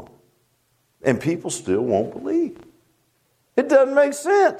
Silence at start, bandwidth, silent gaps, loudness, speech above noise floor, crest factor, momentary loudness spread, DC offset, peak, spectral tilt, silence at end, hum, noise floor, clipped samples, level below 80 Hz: 0 s; 15 kHz; none; -21 LUFS; 47 dB; 18 dB; 9 LU; under 0.1%; -2 dBFS; -5.5 dB/octave; 0 s; none; -66 dBFS; under 0.1%; -64 dBFS